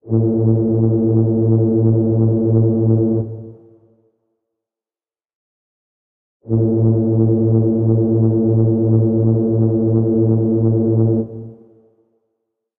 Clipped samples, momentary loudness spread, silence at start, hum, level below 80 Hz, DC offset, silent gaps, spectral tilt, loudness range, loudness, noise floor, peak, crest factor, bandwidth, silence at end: under 0.1%; 3 LU; 0.05 s; none; -46 dBFS; under 0.1%; 5.35-6.40 s; -17 dB/octave; 8 LU; -15 LUFS; under -90 dBFS; -4 dBFS; 12 dB; 1.4 kHz; 1.25 s